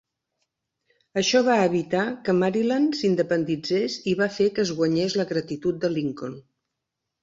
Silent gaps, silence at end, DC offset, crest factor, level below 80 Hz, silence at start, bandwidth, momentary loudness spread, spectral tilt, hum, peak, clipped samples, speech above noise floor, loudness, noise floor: none; 0.8 s; under 0.1%; 16 dB; -64 dBFS; 1.15 s; 7.8 kHz; 8 LU; -5 dB/octave; none; -8 dBFS; under 0.1%; 60 dB; -23 LUFS; -83 dBFS